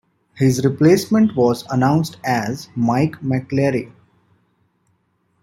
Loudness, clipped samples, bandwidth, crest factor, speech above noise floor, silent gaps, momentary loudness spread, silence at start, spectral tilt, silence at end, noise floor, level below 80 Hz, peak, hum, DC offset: -18 LUFS; under 0.1%; 16.5 kHz; 16 dB; 48 dB; none; 8 LU; 0.35 s; -6.5 dB/octave; 1.55 s; -65 dBFS; -56 dBFS; -2 dBFS; none; under 0.1%